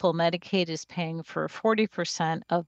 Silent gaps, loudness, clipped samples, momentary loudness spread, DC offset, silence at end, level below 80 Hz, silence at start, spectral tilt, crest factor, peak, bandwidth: none; -28 LUFS; under 0.1%; 8 LU; under 0.1%; 0.05 s; -74 dBFS; 0 s; -5 dB/octave; 18 dB; -10 dBFS; 8.4 kHz